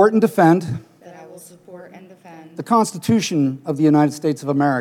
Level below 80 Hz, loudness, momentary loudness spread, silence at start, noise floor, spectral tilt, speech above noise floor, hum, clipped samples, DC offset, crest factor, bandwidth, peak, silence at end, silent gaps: -66 dBFS; -18 LUFS; 19 LU; 0 s; -41 dBFS; -6.5 dB/octave; 24 dB; none; under 0.1%; under 0.1%; 16 dB; 16 kHz; -2 dBFS; 0 s; none